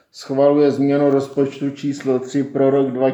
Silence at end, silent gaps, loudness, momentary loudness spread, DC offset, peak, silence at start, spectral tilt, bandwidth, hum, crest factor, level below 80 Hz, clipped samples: 0 s; none; -18 LUFS; 9 LU; under 0.1%; -2 dBFS; 0.15 s; -7.5 dB/octave; 8.2 kHz; none; 16 dB; -72 dBFS; under 0.1%